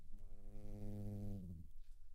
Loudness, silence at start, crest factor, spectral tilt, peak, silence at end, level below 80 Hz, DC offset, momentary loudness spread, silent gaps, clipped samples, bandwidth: -53 LUFS; 0 s; 10 dB; -9 dB/octave; -36 dBFS; 0 s; -52 dBFS; under 0.1%; 14 LU; none; under 0.1%; 2.6 kHz